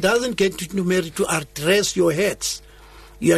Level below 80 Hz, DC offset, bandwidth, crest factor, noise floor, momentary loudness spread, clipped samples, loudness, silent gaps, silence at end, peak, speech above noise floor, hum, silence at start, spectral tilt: -48 dBFS; under 0.1%; 13.5 kHz; 14 dB; -44 dBFS; 7 LU; under 0.1%; -21 LUFS; none; 0 s; -6 dBFS; 24 dB; none; 0 s; -4 dB/octave